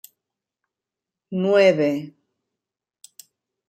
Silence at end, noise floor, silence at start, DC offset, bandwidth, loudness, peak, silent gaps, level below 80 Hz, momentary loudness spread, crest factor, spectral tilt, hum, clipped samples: 1.6 s; -87 dBFS; 1.3 s; under 0.1%; 15 kHz; -20 LUFS; -4 dBFS; none; -74 dBFS; 15 LU; 20 dB; -6 dB/octave; none; under 0.1%